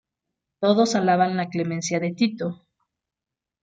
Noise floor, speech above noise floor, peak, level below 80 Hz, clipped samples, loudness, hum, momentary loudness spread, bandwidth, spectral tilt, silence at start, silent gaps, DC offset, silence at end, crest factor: -88 dBFS; 66 dB; -6 dBFS; -70 dBFS; under 0.1%; -23 LUFS; none; 7 LU; 9.4 kHz; -5 dB/octave; 0.6 s; none; under 0.1%; 1.05 s; 18 dB